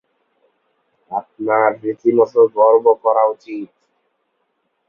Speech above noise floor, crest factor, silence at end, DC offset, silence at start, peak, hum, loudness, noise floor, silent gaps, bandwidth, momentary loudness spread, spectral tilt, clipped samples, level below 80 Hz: 54 dB; 16 dB; 1.25 s; under 0.1%; 1.1 s; 0 dBFS; none; -15 LUFS; -69 dBFS; none; 5.8 kHz; 17 LU; -8.5 dB/octave; under 0.1%; -66 dBFS